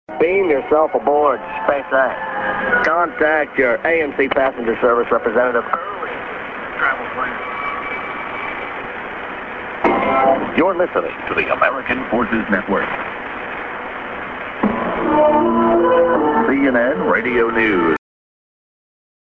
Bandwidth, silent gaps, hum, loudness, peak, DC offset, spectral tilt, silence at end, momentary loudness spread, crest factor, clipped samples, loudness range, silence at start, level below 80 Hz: 6.6 kHz; none; none; -18 LUFS; -2 dBFS; under 0.1%; -7.5 dB/octave; 1.25 s; 12 LU; 16 dB; under 0.1%; 7 LU; 0.1 s; -48 dBFS